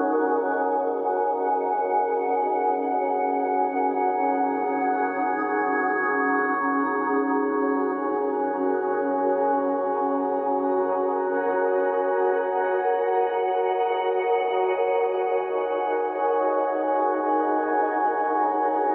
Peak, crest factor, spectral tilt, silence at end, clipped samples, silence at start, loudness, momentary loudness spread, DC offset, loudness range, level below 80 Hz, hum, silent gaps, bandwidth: -12 dBFS; 12 dB; -8 dB/octave; 0 s; under 0.1%; 0 s; -24 LUFS; 2 LU; under 0.1%; 1 LU; -74 dBFS; none; none; 4 kHz